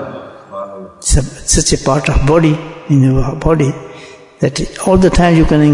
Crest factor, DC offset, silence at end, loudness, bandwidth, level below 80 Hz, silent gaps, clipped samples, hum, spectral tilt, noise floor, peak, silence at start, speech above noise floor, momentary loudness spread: 12 dB; under 0.1%; 0 s; -12 LUFS; 11 kHz; -22 dBFS; none; under 0.1%; none; -5.5 dB/octave; -35 dBFS; 0 dBFS; 0 s; 24 dB; 18 LU